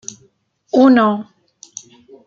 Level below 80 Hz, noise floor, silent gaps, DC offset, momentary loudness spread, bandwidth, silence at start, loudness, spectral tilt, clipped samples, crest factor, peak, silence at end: -64 dBFS; -57 dBFS; none; under 0.1%; 24 LU; 7.4 kHz; 0.75 s; -13 LUFS; -5 dB/octave; under 0.1%; 16 dB; -2 dBFS; 1.05 s